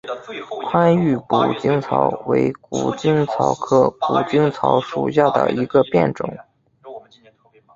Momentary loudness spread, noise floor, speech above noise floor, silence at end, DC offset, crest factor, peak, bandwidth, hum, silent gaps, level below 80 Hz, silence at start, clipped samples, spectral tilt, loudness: 13 LU; -53 dBFS; 35 dB; 0.75 s; under 0.1%; 18 dB; -2 dBFS; 7.8 kHz; none; none; -56 dBFS; 0.05 s; under 0.1%; -7 dB/octave; -18 LUFS